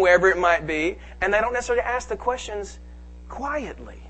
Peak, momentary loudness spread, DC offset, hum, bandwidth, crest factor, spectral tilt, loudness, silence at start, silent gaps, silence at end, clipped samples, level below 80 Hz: -4 dBFS; 17 LU; under 0.1%; none; 8.6 kHz; 18 dB; -4.5 dB/octave; -23 LUFS; 0 s; none; 0 s; under 0.1%; -42 dBFS